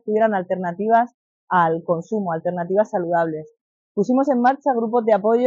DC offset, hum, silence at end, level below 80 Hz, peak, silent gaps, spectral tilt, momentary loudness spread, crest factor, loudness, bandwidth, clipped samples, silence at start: under 0.1%; none; 0 s; -74 dBFS; -6 dBFS; 1.14-1.47 s, 3.61-3.95 s; -6.5 dB/octave; 7 LU; 14 dB; -20 LUFS; 7.4 kHz; under 0.1%; 0.05 s